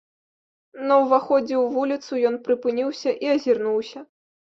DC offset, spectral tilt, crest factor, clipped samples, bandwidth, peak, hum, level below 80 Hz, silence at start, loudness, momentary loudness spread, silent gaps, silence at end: under 0.1%; -5 dB/octave; 16 dB; under 0.1%; 7.4 kHz; -6 dBFS; none; -72 dBFS; 0.75 s; -22 LUFS; 8 LU; none; 0.45 s